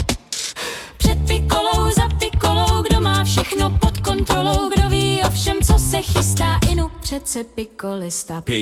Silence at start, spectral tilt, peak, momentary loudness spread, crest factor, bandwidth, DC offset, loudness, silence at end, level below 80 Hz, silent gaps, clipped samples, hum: 0 s; -4.5 dB/octave; -2 dBFS; 8 LU; 16 dB; 17 kHz; under 0.1%; -19 LUFS; 0 s; -24 dBFS; none; under 0.1%; none